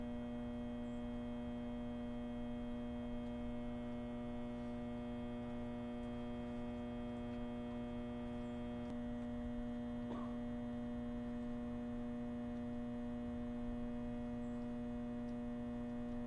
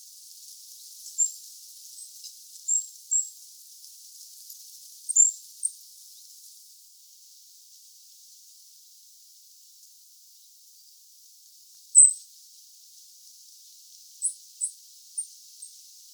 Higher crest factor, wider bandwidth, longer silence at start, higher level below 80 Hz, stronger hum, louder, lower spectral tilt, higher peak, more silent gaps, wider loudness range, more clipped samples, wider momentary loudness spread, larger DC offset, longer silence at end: second, 12 dB vs 30 dB; second, 8.6 kHz vs over 20 kHz; second, 0 s vs 1.05 s; first, -54 dBFS vs under -90 dBFS; neither; second, -46 LUFS vs -23 LUFS; first, -8 dB/octave vs 11 dB/octave; second, -34 dBFS vs -2 dBFS; neither; second, 1 LU vs 13 LU; neither; second, 1 LU vs 29 LU; neither; second, 0 s vs 0.5 s